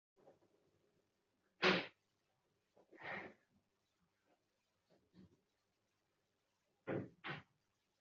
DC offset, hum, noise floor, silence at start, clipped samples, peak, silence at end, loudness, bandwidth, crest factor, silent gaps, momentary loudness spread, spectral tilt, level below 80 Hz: under 0.1%; none; -86 dBFS; 0.25 s; under 0.1%; -20 dBFS; 0.6 s; -42 LUFS; 7.2 kHz; 30 dB; none; 19 LU; -2 dB/octave; -88 dBFS